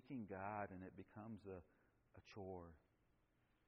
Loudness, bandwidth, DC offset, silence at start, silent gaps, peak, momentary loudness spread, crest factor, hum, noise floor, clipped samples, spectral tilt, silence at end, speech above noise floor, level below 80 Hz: -54 LUFS; 4.6 kHz; under 0.1%; 0 s; none; -34 dBFS; 12 LU; 20 dB; none; -82 dBFS; under 0.1%; -6.5 dB/octave; 0.9 s; 27 dB; -82 dBFS